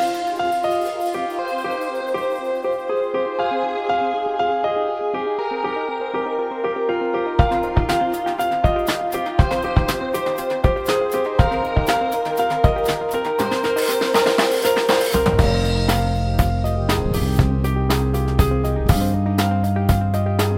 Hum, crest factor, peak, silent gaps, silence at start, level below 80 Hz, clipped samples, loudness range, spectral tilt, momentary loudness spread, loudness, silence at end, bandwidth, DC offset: none; 20 dB; 0 dBFS; none; 0 s; -28 dBFS; under 0.1%; 4 LU; -6 dB/octave; 6 LU; -20 LUFS; 0 s; 16.5 kHz; under 0.1%